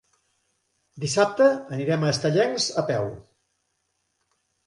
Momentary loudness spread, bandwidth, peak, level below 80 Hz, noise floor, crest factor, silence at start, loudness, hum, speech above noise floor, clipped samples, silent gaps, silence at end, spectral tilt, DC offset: 9 LU; 11.5 kHz; -6 dBFS; -62 dBFS; -75 dBFS; 18 dB; 0.95 s; -23 LUFS; none; 52 dB; under 0.1%; none; 1.45 s; -4.5 dB/octave; under 0.1%